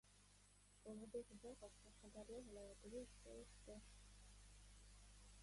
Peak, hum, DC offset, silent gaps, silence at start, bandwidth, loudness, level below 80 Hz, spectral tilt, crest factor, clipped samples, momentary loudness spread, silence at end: -42 dBFS; 50 Hz at -70 dBFS; under 0.1%; none; 0.05 s; 11.5 kHz; -60 LUFS; -68 dBFS; -4.5 dB/octave; 20 dB; under 0.1%; 11 LU; 0 s